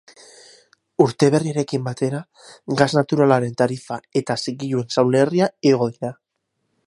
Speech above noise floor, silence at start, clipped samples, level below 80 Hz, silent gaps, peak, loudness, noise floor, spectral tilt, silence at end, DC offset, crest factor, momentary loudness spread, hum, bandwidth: 55 dB; 1 s; under 0.1%; -64 dBFS; none; 0 dBFS; -20 LUFS; -74 dBFS; -6 dB/octave; 0.75 s; under 0.1%; 20 dB; 12 LU; none; 11.5 kHz